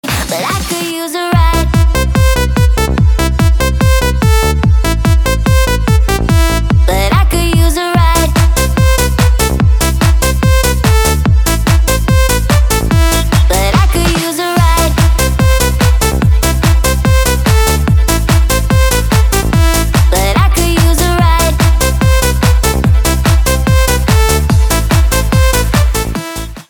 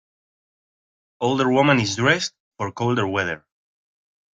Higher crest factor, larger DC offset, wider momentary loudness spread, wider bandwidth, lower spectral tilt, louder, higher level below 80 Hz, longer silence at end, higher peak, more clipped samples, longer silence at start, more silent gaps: second, 10 dB vs 22 dB; neither; second, 1 LU vs 13 LU; first, 19.5 kHz vs 9.2 kHz; about the same, -5 dB/octave vs -5 dB/octave; first, -11 LUFS vs -21 LUFS; first, -12 dBFS vs -60 dBFS; second, 0.05 s vs 0.95 s; about the same, 0 dBFS vs -2 dBFS; neither; second, 0.05 s vs 1.2 s; second, none vs 2.40-2.52 s